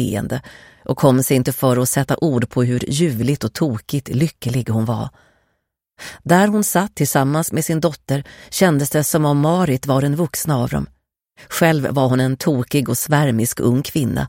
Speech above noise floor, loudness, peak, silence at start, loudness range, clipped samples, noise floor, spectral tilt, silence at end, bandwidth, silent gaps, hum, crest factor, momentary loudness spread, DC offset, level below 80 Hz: 54 dB; -18 LUFS; -2 dBFS; 0 s; 3 LU; under 0.1%; -71 dBFS; -5.5 dB/octave; 0 s; 16.5 kHz; none; none; 16 dB; 9 LU; under 0.1%; -46 dBFS